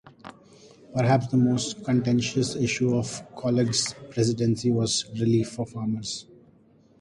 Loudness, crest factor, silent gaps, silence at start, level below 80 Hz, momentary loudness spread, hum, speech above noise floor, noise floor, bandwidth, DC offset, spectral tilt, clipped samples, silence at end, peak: -25 LUFS; 18 dB; none; 0.05 s; -58 dBFS; 9 LU; none; 33 dB; -58 dBFS; 11.5 kHz; under 0.1%; -5 dB/octave; under 0.1%; 0.8 s; -8 dBFS